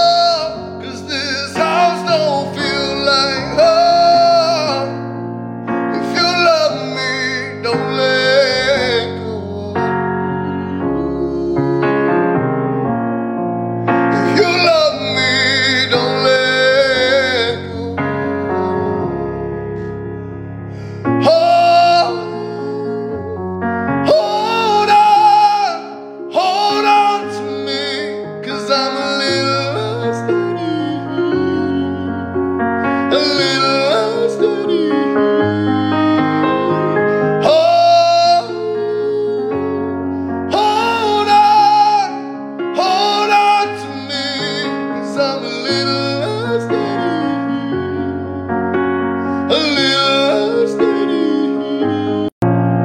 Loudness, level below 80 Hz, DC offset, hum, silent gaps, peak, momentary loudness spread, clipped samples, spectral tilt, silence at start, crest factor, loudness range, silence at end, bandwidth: -15 LUFS; -48 dBFS; under 0.1%; none; 52.32-52.41 s; -2 dBFS; 12 LU; under 0.1%; -5 dB/octave; 0 s; 14 dB; 5 LU; 0 s; 14 kHz